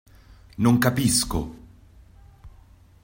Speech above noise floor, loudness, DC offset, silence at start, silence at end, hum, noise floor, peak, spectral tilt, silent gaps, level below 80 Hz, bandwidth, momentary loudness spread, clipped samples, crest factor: 30 dB; -22 LUFS; under 0.1%; 0.6 s; 0.55 s; none; -52 dBFS; -6 dBFS; -4.5 dB/octave; none; -44 dBFS; 16.5 kHz; 17 LU; under 0.1%; 20 dB